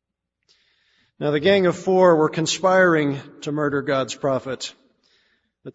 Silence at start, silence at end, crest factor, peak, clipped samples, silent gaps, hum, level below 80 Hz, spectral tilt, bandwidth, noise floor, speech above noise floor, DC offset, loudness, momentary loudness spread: 1.2 s; 0.05 s; 18 dB; -4 dBFS; under 0.1%; none; none; -62 dBFS; -5 dB/octave; 8 kHz; -72 dBFS; 52 dB; under 0.1%; -20 LUFS; 14 LU